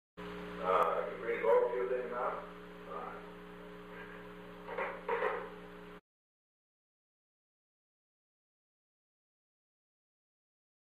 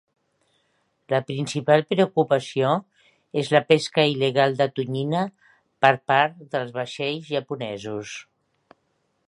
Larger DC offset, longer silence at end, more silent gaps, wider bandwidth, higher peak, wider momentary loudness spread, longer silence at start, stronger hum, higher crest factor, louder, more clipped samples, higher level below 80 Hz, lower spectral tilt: neither; first, 4.8 s vs 1.05 s; neither; first, 14.5 kHz vs 11.5 kHz; second, -18 dBFS vs 0 dBFS; first, 20 LU vs 12 LU; second, 0.15 s vs 1.1 s; first, 60 Hz at -65 dBFS vs none; about the same, 22 dB vs 24 dB; second, -36 LUFS vs -23 LUFS; neither; about the same, -68 dBFS vs -70 dBFS; about the same, -6 dB/octave vs -5.5 dB/octave